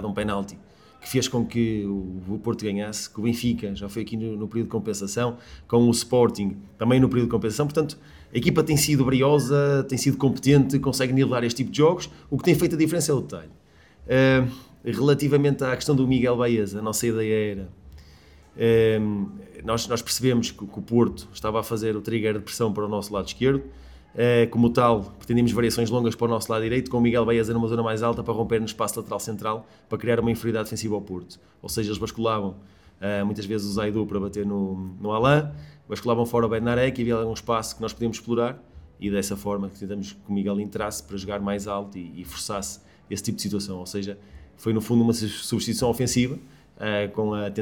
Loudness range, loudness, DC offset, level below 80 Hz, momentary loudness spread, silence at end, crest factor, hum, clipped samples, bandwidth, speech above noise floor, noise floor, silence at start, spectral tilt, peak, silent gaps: 7 LU; -24 LUFS; under 0.1%; -48 dBFS; 12 LU; 0 s; 18 dB; none; under 0.1%; 19 kHz; 27 dB; -51 dBFS; 0 s; -5.5 dB/octave; -6 dBFS; none